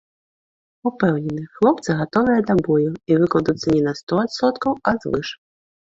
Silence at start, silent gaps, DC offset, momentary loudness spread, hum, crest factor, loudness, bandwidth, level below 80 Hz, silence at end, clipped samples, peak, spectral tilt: 0.85 s; 4.03-4.07 s; under 0.1%; 8 LU; none; 18 dB; -20 LUFS; 7.8 kHz; -52 dBFS; 0.6 s; under 0.1%; -2 dBFS; -7 dB/octave